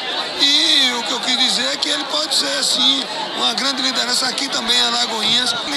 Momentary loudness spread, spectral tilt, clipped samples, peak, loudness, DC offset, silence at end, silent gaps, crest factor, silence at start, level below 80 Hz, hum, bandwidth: 6 LU; 0 dB/octave; under 0.1%; 0 dBFS; -15 LUFS; under 0.1%; 0 s; none; 18 dB; 0 s; -60 dBFS; none; 15.5 kHz